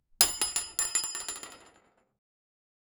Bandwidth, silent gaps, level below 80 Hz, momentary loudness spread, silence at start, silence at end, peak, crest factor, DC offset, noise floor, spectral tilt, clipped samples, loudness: over 20 kHz; none; -62 dBFS; 16 LU; 0.2 s; 1.35 s; -2 dBFS; 34 dB; under 0.1%; -65 dBFS; 1.5 dB/octave; under 0.1%; -28 LUFS